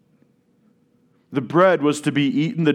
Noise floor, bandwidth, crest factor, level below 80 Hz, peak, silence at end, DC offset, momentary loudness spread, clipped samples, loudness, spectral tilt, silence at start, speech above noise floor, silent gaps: -60 dBFS; 12.5 kHz; 18 dB; -76 dBFS; -2 dBFS; 0 s; under 0.1%; 10 LU; under 0.1%; -19 LUFS; -6 dB/octave; 1.3 s; 42 dB; none